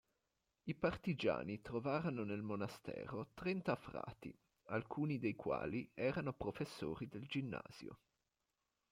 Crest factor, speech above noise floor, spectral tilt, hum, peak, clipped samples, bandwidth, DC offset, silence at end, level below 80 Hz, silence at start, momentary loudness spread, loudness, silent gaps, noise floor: 20 dB; 46 dB; -7.5 dB/octave; none; -24 dBFS; under 0.1%; 16 kHz; under 0.1%; 0.95 s; -70 dBFS; 0.65 s; 10 LU; -43 LUFS; none; -89 dBFS